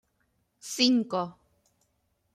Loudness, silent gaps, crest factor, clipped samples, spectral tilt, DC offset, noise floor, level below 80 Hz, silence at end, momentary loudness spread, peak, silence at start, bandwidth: -26 LUFS; none; 22 dB; under 0.1%; -3 dB/octave; under 0.1%; -74 dBFS; -74 dBFS; 1.05 s; 16 LU; -8 dBFS; 0.65 s; 14.5 kHz